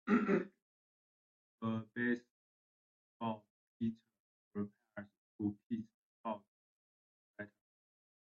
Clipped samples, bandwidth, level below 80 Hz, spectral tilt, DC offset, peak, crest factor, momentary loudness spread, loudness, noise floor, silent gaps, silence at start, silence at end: under 0.1%; 7 kHz; -82 dBFS; -6.5 dB/octave; under 0.1%; -20 dBFS; 24 dB; 16 LU; -41 LUFS; under -90 dBFS; 0.62-1.58 s, 2.31-3.20 s, 3.50-3.80 s, 4.20-4.51 s, 5.18-5.39 s, 5.66-5.70 s, 5.94-6.24 s, 6.48-7.34 s; 0.05 s; 0.9 s